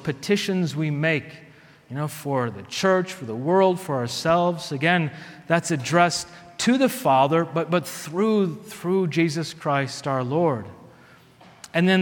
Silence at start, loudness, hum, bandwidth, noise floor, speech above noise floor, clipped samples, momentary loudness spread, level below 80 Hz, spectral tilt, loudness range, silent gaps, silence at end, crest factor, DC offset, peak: 0 s; -23 LUFS; none; 19 kHz; -51 dBFS; 29 dB; under 0.1%; 10 LU; -64 dBFS; -5.5 dB/octave; 3 LU; none; 0 s; 20 dB; under 0.1%; -4 dBFS